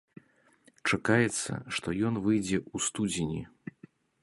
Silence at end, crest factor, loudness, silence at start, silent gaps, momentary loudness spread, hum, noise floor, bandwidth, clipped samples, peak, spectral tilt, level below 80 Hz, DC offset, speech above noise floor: 0.75 s; 22 dB; -30 LUFS; 0.85 s; none; 13 LU; none; -64 dBFS; 11.5 kHz; under 0.1%; -10 dBFS; -4.5 dB/octave; -58 dBFS; under 0.1%; 34 dB